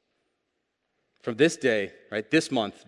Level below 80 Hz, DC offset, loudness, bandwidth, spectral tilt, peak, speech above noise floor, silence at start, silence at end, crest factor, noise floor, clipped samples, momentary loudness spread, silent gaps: -72 dBFS; under 0.1%; -26 LUFS; 11.5 kHz; -4.5 dB/octave; -8 dBFS; 53 dB; 1.25 s; 0.15 s; 20 dB; -79 dBFS; under 0.1%; 12 LU; none